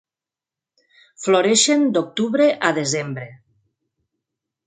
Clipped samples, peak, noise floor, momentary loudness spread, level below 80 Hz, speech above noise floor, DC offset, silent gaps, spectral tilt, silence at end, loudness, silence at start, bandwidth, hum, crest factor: under 0.1%; -2 dBFS; -89 dBFS; 15 LU; -70 dBFS; 71 dB; under 0.1%; none; -3 dB/octave; 1.3 s; -18 LUFS; 1.2 s; 9.6 kHz; none; 20 dB